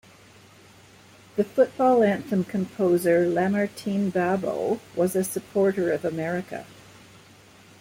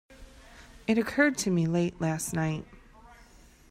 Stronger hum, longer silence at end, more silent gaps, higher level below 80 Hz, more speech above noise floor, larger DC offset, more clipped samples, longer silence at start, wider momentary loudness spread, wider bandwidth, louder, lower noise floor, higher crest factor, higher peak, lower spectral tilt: neither; first, 1.1 s vs 0.55 s; neither; second, -66 dBFS vs -54 dBFS; about the same, 28 dB vs 28 dB; neither; neither; first, 1.35 s vs 0.1 s; about the same, 9 LU vs 8 LU; about the same, 16.5 kHz vs 16 kHz; first, -24 LUFS vs -28 LUFS; about the same, -52 dBFS vs -55 dBFS; about the same, 18 dB vs 20 dB; first, -8 dBFS vs -12 dBFS; about the same, -6.5 dB/octave vs -5.5 dB/octave